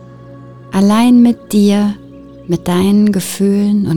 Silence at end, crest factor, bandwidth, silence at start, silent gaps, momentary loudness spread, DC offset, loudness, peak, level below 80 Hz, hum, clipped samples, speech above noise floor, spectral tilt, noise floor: 0 s; 10 dB; 17.5 kHz; 0 s; none; 11 LU; under 0.1%; -12 LUFS; -2 dBFS; -46 dBFS; none; under 0.1%; 23 dB; -6.5 dB/octave; -34 dBFS